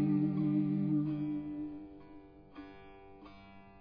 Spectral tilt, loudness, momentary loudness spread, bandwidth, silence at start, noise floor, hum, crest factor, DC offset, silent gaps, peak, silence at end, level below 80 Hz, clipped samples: -10 dB/octave; -34 LUFS; 24 LU; 5 kHz; 0 s; -55 dBFS; none; 14 dB; under 0.1%; none; -22 dBFS; 0 s; -64 dBFS; under 0.1%